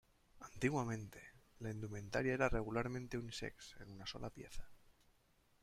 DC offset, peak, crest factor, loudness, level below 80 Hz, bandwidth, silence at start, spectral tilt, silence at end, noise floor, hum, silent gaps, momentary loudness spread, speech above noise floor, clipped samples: under 0.1%; -20 dBFS; 24 dB; -43 LUFS; -56 dBFS; 15.5 kHz; 0.35 s; -5.5 dB/octave; 0.7 s; -74 dBFS; none; none; 20 LU; 32 dB; under 0.1%